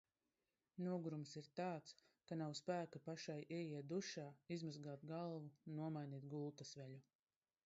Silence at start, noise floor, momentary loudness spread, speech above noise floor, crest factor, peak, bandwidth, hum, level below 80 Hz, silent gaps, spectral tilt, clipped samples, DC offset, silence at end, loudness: 0.75 s; under -90 dBFS; 9 LU; over 40 dB; 18 dB; -32 dBFS; 7.6 kHz; none; under -90 dBFS; none; -6 dB/octave; under 0.1%; under 0.1%; 0.65 s; -50 LUFS